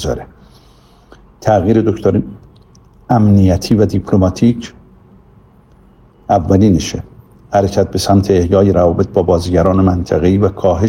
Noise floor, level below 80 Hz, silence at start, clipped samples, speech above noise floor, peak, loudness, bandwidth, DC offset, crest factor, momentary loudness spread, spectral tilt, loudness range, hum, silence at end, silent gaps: -45 dBFS; -34 dBFS; 0 s; under 0.1%; 34 dB; 0 dBFS; -13 LUFS; 15.5 kHz; under 0.1%; 14 dB; 11 LU; -7.5 dB/octave; 4 LU; none; 0 s; none